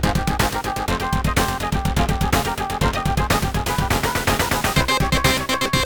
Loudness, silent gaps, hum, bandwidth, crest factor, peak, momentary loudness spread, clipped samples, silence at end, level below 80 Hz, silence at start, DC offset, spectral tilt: -20 LUFS; none; none; over 20 kHz; 16 dB; -4 dBFS; 4 LU; under 0.1%; 0 s; -28 dBFS; 0 s; under 0.1%; -4 dB/octave